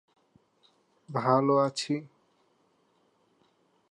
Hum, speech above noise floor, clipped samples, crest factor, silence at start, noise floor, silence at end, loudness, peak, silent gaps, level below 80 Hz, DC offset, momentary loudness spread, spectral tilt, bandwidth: none; 43 dB; under 0.1%; 22 dB; 1.1 s; -69 dBFS; 1.85 s; -27 LUFS; -10 dBFS; none; -84 dBFS; under 0.1%; 11 LU; -6 dB/octave; 11 kHz